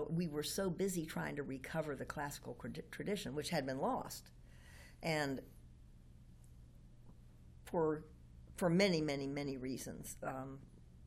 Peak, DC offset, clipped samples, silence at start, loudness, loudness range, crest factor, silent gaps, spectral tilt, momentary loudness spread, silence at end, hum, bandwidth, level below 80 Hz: -20 dBFS; under 0.1%; under 0.1%; 0 s; -41 LUFS; 7 LU; 20 dB; none; -5 dB/octave; 22 LU; 0 s; none; 16.5 kHz; -62 dBFS